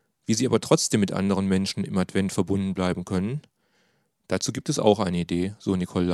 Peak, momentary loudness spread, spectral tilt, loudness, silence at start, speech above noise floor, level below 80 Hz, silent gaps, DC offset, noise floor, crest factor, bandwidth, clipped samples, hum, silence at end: -4 dBFS; 6 LU; -5 dB/octave; -25 LUFS; 0.3 s; 44 dB; -62 dBFS; none; under 0.1%; -68 dBFS; 22 dB; 13.5 kHz; under 0.1%; none; 0 s